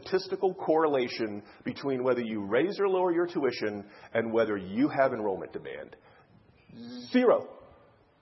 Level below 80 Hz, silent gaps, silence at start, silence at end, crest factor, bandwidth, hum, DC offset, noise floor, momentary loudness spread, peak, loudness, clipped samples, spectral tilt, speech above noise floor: -72 dBFS; none; 0 s; 0.55 s; 20 dB; 6 kHz; none; under 0.1%; -60 dBFS; 16 LU; -10 dBFS; -29 LUFS; under 0.1%; -7.5 dB/octave; 31 dB